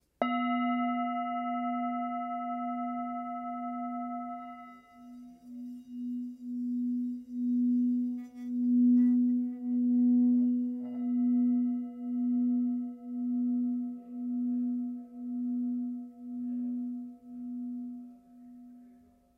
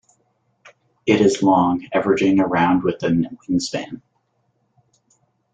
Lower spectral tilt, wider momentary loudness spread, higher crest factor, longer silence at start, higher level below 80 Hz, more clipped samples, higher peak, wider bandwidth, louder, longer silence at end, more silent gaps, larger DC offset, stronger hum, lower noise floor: first, -8 dB/octave vs -6 dB/octave; first, 17 LU vs 11 LU; about the same, 16 dB vs 18 dB; second, 0.2 s vs 1.05 s; second, -78 dBFS vs -56 dBFS; neither; second, -16 dBFS vs -2 dBFS; second, 4 kHz vs 9.2 kHz; second, -32 LUFS vs -19 LUFS; second, 0.45 s vs 1.55 s; neither; neither; neither; second, -60 dBFS vs -67 dBFS